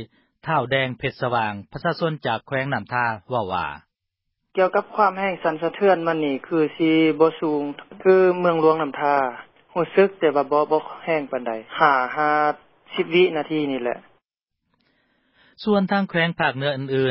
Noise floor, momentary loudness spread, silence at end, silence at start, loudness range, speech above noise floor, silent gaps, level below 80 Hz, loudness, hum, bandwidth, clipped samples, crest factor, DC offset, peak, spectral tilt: -80 dBFS; 10 LU; 0 s; 0 s; 5 LU; 59 dB; none; -60 dBFS; -21 LUFS; none; 5.8 kHz; under 0.1%; 20 dB; under 0.1%; -2 dBFS; -10.5 dB/octave